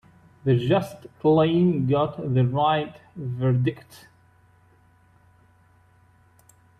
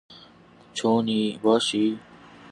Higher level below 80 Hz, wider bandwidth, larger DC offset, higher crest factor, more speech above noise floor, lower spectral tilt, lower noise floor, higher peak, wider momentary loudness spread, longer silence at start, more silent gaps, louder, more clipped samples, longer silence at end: first, -60 dBFS vs -68 dBFS; about the same, 10 kHz vs 11 kHz; neither; about the same, 16 dB vs 18 dB; first, 36 dB vs 29 dB; first, -8.5 dB/octave vs -4.5 dB/octave; first, -58 dBFS vs -52 dBFS; about the same, -8 dBFS vs -8 dBFS; first, 15 LU vs 11 LU; first, 0.45 s vs 0.1 s; neither; about the same, -23 LUFS vs -23 LUFS; neither; first, 2.85 s vs 0.5 s